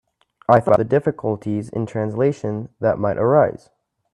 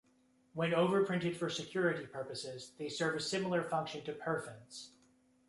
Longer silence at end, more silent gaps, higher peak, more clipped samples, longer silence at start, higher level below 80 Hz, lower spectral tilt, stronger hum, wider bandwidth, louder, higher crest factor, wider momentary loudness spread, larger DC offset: about the same, 0.55 s vs 0.6 s; neither; first, 0 dBFS vs -20 dBFS; neither; about the same, 0.5 s vs 0.55 s; first, -54 dBFS vs -76 dBFS; first, -9 dB/octave vs -5 dB/octave; neither; about the same, 10.5 kHz vs 11.5 kHz; first, -19 LUFS vs -36 LUFS; about the same, 20 dB vs 18 dB; second, 11 LU vs 17 LU; neither